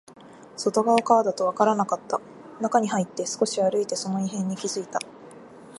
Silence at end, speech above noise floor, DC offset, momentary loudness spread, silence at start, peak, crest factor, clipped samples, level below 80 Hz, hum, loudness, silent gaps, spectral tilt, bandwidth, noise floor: 0 s; 21 dB; under 0.1%; 11 LU; 0.2 s; -4 dBFS; 22 dB; under 0.1%; -74 dBFS; none; -25 LUFS; none; -4.5 dB/octave; 11.5 kHz; -45 dBFS